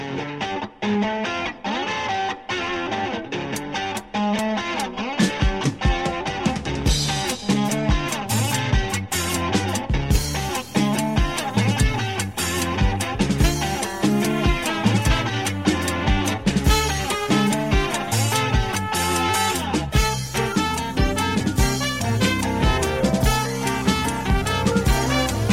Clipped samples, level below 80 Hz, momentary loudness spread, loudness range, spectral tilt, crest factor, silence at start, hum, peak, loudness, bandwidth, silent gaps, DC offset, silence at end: under 0.1%; -28 dBFS; 6 LU; 4 LU; -4.5 dB/octave; 18 dB; 0 s; none; -4 dBFS; -22 LUFS; 16.5 kHz; none; 0.3%; 0 s